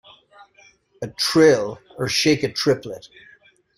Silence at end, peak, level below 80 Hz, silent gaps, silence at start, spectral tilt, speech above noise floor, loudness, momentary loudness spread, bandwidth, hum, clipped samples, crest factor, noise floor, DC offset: 0.7 s; -2 dBFS; -58 dBFS; none; 1 s; -4 dB/octave; 35 dB; -19 LUFS; 20 LU; 16 kHz; none; under 0.1%; 20 dB; -55 dBFS; under 0.1%